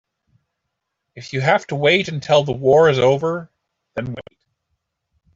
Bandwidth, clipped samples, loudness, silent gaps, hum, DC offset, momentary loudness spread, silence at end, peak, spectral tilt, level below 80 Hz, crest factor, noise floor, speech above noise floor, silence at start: 7.8 kHz; under 0.1%; -17 LUFS; none; none; under 0.1%; 17 LU; 1.15 s; -2 dBFS; -5.5 dB/octave; -56 dBFS; 18 dB; -78 dBFS; 61 dB; 1.15 s